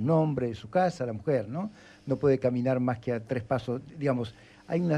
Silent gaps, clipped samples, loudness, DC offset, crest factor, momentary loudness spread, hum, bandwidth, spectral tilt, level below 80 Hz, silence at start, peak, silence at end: none; under 0.1%; -29 LUFS; under 0.1%; 16 dB; 10 LU; none; 10 kHz; -8.5 dB/octave; -62 dBFS; 0 s; -12 dBFS; 0 s